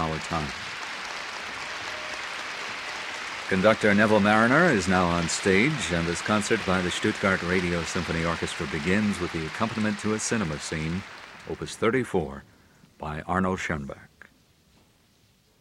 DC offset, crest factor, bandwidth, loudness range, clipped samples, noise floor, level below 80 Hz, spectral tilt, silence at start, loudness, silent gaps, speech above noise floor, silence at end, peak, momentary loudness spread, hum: under 0.1%; 20 dB; 13.5 kHz; 10 LU; under 0.1%; -62 dBFS; -50 dBFS; -4.5 dB/octave; 0 s; -26 LUFS; none; 37 dB; 1.55 s; -6 dBFS; 13 LU; none